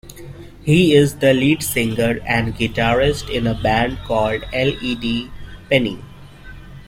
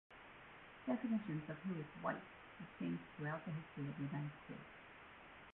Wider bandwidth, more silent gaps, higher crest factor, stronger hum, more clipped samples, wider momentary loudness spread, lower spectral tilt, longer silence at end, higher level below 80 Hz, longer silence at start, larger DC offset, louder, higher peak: first, 16.5 kHz vs 4 kHz; neither; about the same, 18 dB vs 20 dB; neither; neither; second, 12 LU vs 16 LU; about the same, -5.5 dB/octave vs -6.5 dB/octave; about the same, 0 s vs 0 s; first, -36 dBFS vs -76 dBFS; about the same, 0.05 s vs 0.1 s; neither; first, -18 LUFS vs -46 LUFS; first, -2 dBFS vs -28 dBFS